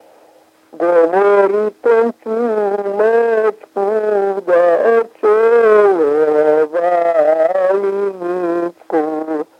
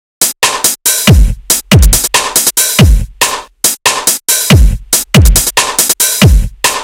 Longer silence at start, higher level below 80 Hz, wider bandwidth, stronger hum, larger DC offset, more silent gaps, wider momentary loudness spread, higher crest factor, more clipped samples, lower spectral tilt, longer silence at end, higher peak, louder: first, 0.75 s vs 0.2 s; second, -74 dBFS vs -14 dBFS; second, 8.6 kHz vs over 20 kHz; neither; neither; neither; first, 8 LU vs 5 LU; first, 14 dB vs 8 dB; second, under 0.1% vs 3%; first, -6.5 dB/octave vs -3 dB/octave; first, 0.15 s vs 0 s; about the same, 0 dBFS vs 0 dBFS; second, -14 LUFS vs -8 LUFS